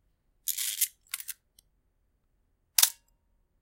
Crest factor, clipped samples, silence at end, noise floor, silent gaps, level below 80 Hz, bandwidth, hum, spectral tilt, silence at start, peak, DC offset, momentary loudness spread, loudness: 34 dB; under 0.1%; 0.7 s; -73 dBFS; none; -74 dBFS; 17 kHz; none; 5.5 dB/octave; 0.45 s; 0 dBFS; under 0.1%; 16 LU; -28 LUFS